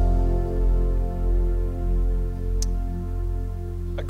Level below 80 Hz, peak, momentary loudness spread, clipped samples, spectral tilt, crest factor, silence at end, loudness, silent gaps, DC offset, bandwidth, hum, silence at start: -22 dBFS; -10 dBFS; 6 LU; under 0.1%; -7.5 dB/octave; 12 dB; 0 s; -27 LUFS; none; under 0.1%; 7.8 kHz; none; 0 s